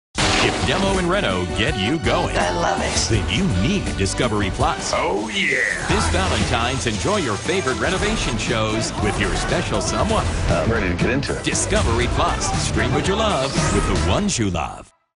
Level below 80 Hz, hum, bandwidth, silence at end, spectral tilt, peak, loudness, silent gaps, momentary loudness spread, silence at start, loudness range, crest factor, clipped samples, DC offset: -30 dBFS; none; 11 kHz; 0.3 s; -4 dB/octave; -6 dBFS; -20 LUFS; none; 3 LU; 0.15 s; 1 LU; 14 dB; under 0.1%; under 0.1%